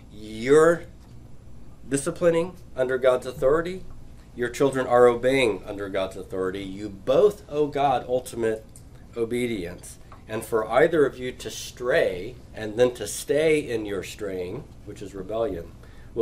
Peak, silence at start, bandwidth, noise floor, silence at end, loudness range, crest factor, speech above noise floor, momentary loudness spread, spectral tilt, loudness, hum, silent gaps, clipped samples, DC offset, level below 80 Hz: -6 dBFS; 0 s; 16 kHz; -44 dBFS; 0 s; 4 LU; 20 dB; 20 dB; 17 LU; -5 dB/octave; -24 LUFS; none; none; under 0.1%; under 0.1%; -46 dBFS